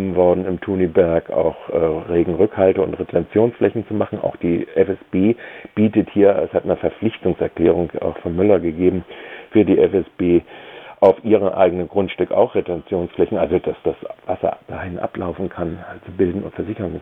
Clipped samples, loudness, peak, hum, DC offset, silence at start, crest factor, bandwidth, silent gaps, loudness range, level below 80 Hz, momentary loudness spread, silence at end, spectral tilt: under 0.1%; -19 LUFS; 0 dBFS; none; under 0.1%; 0 s; 18 dB; 3.9 kHz; none; 5 LU; -50 dBFS; 11 LU; 0 s; -10 dB/octave